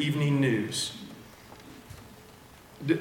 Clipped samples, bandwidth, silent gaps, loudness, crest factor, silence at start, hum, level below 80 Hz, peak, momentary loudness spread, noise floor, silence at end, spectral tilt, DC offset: under 0.1%; 18 kHz; none; -28 LUFS; 18 dB; 0 s; none; -62 dBFS; -12 dBFS; 25 LU; -52 dBFS; 0 s; -5 dB/octave; under 0.1%